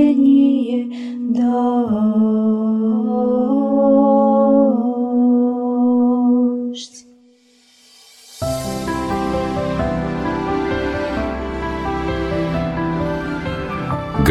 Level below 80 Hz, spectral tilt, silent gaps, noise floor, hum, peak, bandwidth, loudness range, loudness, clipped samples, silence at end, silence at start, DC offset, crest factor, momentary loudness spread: -36 dBFS; -7.5 dB/octave; none; -52 dBFS; none; -2 dBFS; 13 kHz; 8 LU; -18 LUFS; under 0.1%; 0 s; 0 s; under 0.1%; 16 dB; 11 LU